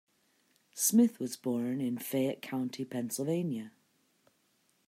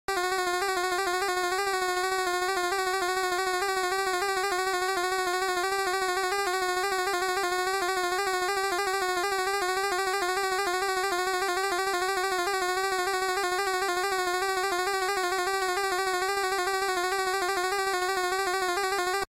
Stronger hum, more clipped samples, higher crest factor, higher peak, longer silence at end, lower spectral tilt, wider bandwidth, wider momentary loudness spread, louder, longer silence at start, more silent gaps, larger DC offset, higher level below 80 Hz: neither; neither; first, 20 dB vs 12 dB; about the same, -14 dBFS vs -16 dBFS; first, 1.2 s vs 0.05 s; first, -5 dB/octave vs -1 dB/octave; about the same, 16 kHz vs 16 kHz; first, 11 LU vs 0 LU; second, -32 LUFS vs -27 LUFS; first, 0.75 s vs 0.1 s; neither; neither; second, -84 dBFS vs -58 dBFS